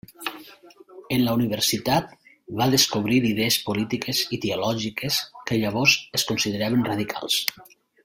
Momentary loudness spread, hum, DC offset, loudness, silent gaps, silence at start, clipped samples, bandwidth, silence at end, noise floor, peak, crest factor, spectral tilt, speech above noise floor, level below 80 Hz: 9 LU; none; under 0.1%; -23 LUFS; none; 0.2 s; under 0.1%; 17 kHz; 0.4 s; -49 dBFS; 0 dBFS; 24 dB; -3.5 dB/octave; 25 dB; -56 dBFS